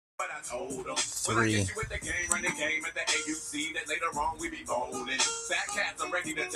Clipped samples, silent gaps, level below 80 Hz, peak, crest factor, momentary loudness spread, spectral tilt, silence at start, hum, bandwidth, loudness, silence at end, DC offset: under 0.1%; none; -54 dBFS; -8 dBFS; 24 dB; 8 LU; -2.5 dB/octave; 0.2 s; none; 15 kHz; -31 LUFS; 0 s; under 0.1%